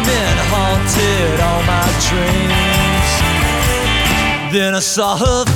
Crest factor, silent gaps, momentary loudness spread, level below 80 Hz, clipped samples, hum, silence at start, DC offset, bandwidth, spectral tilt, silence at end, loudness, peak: 14 dB; none; 2 LU; -22 dBFS; under 0.1%; none; 0 s; under 0.1%; over 20 kHz; -4 dB/octave; 0 s; -14 LUFS; 0 dBFS